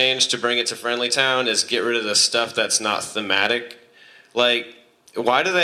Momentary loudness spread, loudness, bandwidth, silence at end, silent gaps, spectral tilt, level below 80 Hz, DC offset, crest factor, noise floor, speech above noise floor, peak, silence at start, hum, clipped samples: 8 LU; -19 LUFS; 15 kHz; 0 s; none; -1 dB/octave; -72 dBFS; under 0.1%; 18 dB; -50 dBFS; 29 dB; -2 dBFS; 0 s; none; under 0.1%